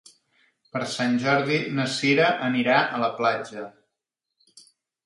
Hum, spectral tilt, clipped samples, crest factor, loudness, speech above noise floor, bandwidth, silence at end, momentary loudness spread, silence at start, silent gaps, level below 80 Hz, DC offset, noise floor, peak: none; -5 dB/octave; under 0.1%; 20 dB; -23 LUFS; 60 dB; 11.5 kHz; 0.45 s; 13 LU; 0.75 s; none; -72 dBFS; under 0.1%; -84 dBFS; -6 dBFS